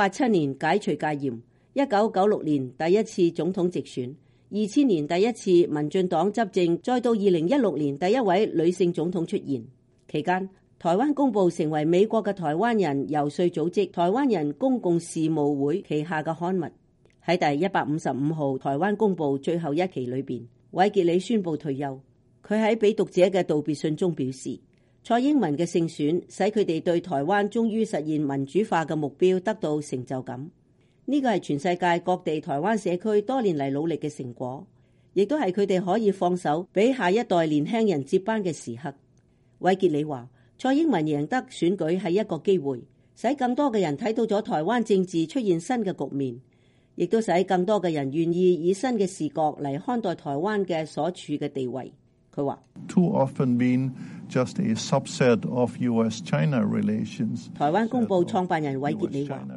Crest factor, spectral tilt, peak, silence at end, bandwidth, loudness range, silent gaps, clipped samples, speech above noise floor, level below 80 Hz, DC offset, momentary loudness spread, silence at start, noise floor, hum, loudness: 18 dB; -6.5 dB/octave; -8 dBFS; 0 s; 11.5 kHz; 3 LU; none; under 0.1%; 37 dB; -68 dBFS; under 0.1%; 9 LU; 0 s; -61 dBFS; none; -25 LUFS